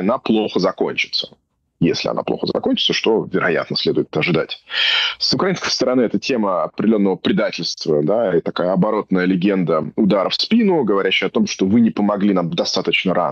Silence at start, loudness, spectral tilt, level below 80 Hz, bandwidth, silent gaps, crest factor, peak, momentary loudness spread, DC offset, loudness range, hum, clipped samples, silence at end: 0 s; -18 LUFS; -5 dB/octave; -56 dBFS; 7.4 kHz; none; 12 dB; -6 dBFS; 5 LU; under 0.1%; 2 LU; none; under 0.1%; 0 s